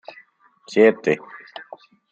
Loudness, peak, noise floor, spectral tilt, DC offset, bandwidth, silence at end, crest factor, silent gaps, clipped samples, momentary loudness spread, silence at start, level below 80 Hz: -19 LUFS; -2 dBFS; -54 dBFS; -6 dB/octave; under 0.1%; 7.8 kHz; 0.95 s; 20 dB; none; under 0.1%; 22 LU; 0.7 s; -70 dBFS